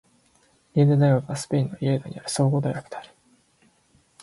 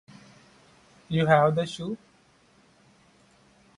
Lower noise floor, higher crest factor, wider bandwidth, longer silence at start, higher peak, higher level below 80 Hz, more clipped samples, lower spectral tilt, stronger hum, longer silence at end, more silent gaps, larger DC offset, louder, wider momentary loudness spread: about the same, -62 dBFS vs -61 dBFS; second, 18 dB vs 24 dB; about the same, 11.5 kHz vs 11 kHz; second, 0.75 s vs 1.1 s; about the same, -8 dBFS vs -6 dBFS; about the same, -62 dBFS vs -62 dBFS; neither; about the same, -7 dB/octave vs -6.5 dB/octave; neither; second, 1.2 s vs 1.8 s; neither; neither; about the same, -23 LUFS vs -25 LUFS; second, 13 LU vs 16 LU